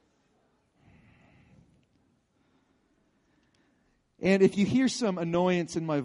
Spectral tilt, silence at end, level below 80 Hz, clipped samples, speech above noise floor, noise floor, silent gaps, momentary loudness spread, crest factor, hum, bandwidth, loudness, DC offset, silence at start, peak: -6 dB/octave; 0 s; -66 dBFS; under 0.1%; 45 dB; -70 dBFS; none; 7 LU; 22 dB; none; 11 kHz; -26 LUFS; under 0.1%; 4.2 s; -10 dBFS